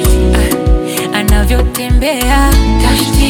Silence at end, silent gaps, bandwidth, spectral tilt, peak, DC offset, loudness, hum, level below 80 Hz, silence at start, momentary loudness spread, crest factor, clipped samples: 0 s; none; 17.5 kHz; -5 dB/octave; 0 dBFS; under 0.1%; -11 LUFS; none; -12 dBFS; 0 s; 4 LU; 10 dB; under 0.1%